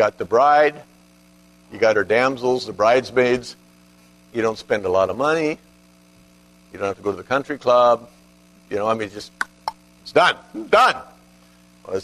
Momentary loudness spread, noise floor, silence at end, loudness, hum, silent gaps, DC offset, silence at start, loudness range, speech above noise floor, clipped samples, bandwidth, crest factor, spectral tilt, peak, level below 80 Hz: 15 LU; -52 dBFS; 0 s; -19 LUFS; 60 Hz at -55 dBFS; none; under 0.1%; 0 s; 4 LU; 33 dB; under 0.1%; 13.5 kHz; 20 dB; -4.5 dB/octave; -2 dBFS; -58 dBFS